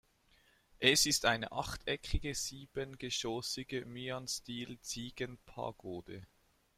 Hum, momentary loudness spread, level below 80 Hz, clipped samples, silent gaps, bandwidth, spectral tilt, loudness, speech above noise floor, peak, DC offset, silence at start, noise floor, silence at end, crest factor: none; 16 LU; -52 dBFS; under 0.1%; none; 16 kHz; -2.5 dB/octave; -36 LUFS; 32 dB; -12 dBFS; under 0.1%; 0.8 s; -70 dBFS; 0.55 s; 26 dB